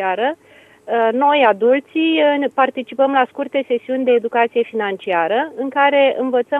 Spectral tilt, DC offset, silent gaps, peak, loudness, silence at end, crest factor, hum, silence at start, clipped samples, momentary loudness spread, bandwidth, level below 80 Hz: -6 dB/octave; under 0.1%; none; 0 dBFS; -17 LUFS; 0 s; 16 dB; none; 0 s; under 0.1%; 8 LU; 4 kHz; -72 dBFS